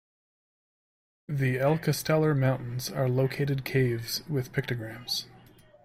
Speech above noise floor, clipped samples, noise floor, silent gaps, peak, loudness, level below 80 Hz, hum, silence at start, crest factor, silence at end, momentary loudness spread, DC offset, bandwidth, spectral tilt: 27 dB; under 0.1%; -55 dBFS; none; -14 dBFS; -28 LUFS; -60 dBFS; none; 1.3 s; 16 dB; 0.55 s; 8 LU; under 0.1%; 16 kHz; -5.5 dB/octave